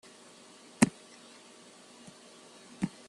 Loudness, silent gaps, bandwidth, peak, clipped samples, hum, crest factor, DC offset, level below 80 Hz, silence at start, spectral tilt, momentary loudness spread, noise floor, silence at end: -31 LUFS; none; 12.5 kHz; -6 dBFS; under 0.1%; none; 32 dB; under 0.1%; -68 dBFS; 0.8 s; -4.5 dB/octave; 24 LU; -55 dBFS; 0.2 s